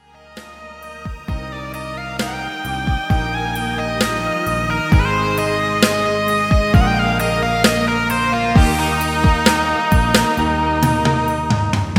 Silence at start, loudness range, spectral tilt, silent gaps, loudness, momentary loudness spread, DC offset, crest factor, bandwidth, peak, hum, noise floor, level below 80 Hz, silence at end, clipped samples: 0.3 s; 7 LU; -5 dB/octave; none; -17 LUFS; 13 LU; under 0.1%; 18 dB; 16.5 kHz; 0 dBFS; none; -40 dBFS; -26 dBFS; 0 s; under 0.1%